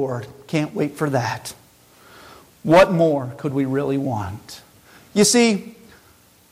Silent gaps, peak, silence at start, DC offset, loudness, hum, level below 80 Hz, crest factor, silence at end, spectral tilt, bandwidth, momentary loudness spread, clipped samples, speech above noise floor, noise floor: none; -4 dBFS; 0 s; under 0.1%; -20 LUFS; none; -52 dBFS; 16 dB; 0.8 s; -4.5 dB/octave; 16.5 kHz; 17 LU; under 0.1%; 34 dB; -53 dBFS